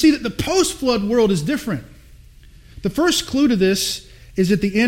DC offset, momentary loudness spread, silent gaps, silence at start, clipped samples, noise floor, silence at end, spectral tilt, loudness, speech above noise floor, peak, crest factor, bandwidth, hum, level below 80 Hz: under 0.1%; 11 LU; none; 0 s; under 0.1%; -44 dBFS; 0 s; -4.5 dB/octave; -19 LUFS; 27 dB; -4 dBFS; 16 dB; 16.5 kHz; none; -42 dBFS